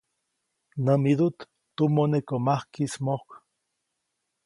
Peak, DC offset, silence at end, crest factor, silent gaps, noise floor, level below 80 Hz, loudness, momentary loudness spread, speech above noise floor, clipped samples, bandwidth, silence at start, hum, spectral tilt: -8 dBFS; under 0.1%; 1.1 s; 18 dB; none; -80 dBFS; -70 dBFS; -26 LUFS; 10 LU; 56 dB; under 0.1%; 11.5 kHz; 0.75 s; none; -7.5 dB/octave